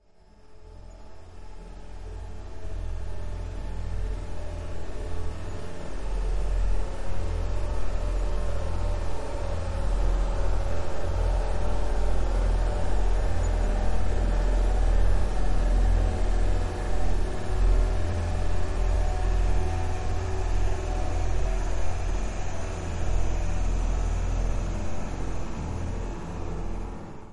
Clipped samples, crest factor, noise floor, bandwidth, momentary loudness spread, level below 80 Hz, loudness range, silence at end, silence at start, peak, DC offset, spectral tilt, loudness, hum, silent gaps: under 0.1%; 12 dB; -52 dBFS; 11 kHz; 11 LU; -28 dBFS; 9 LU; 0 s; 0.5 s; -12 dBFS; under 0.1%; -6.5 dB/octave; -31 LUFS; none; none